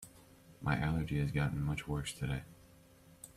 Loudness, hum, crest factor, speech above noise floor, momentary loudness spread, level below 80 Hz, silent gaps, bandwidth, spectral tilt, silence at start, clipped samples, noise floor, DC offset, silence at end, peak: -37 LUFS; none; 18 dB; 26 dB; 17 LU; -52 dBFS; none; 14.5 kHz; -6 dB/octave; 0 s; under 0.1%; -61 dBFS; under 0.1%; 0.05 s; -20 dBFS